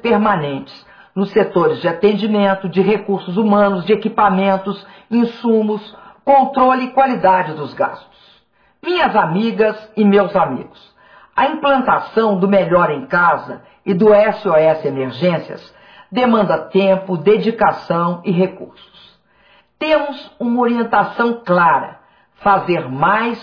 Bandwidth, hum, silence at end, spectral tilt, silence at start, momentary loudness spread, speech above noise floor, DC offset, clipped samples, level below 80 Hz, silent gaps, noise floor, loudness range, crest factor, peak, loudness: 5.4 kHz; none; 0 s; -9 dB/octave; 0.05 s; 11 LU; 41 dB; under 0.1%; under 0.1%; -54 dBFS; none; -56 dBFS; 3 LU; 14 dB; -2 dBFS; -15 LUFS